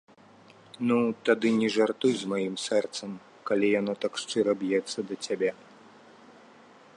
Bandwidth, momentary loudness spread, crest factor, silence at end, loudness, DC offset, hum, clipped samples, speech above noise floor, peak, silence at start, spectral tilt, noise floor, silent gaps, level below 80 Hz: 11.5 kHz; 9 LU; 20 dB; 1.4 s; -28 LUFS; under 0.1%; none; under 0.1%; 28 dB; -8 dBFS; 0.8 s; -4.5 dB/octave; -55 dBFS; none; -76 dBFS